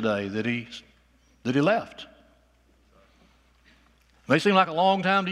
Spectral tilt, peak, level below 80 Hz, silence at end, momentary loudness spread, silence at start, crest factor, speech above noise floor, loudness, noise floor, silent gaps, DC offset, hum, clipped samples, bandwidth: -6 dB/octave; -6 dBFS; -64 dBFS; 0 s; 22 LU; 0 s; 22 dB; 38 dB; -24 LUFS; -62 dBFS; none; under 0.1%; none; under 0.1%; 12.5 kHz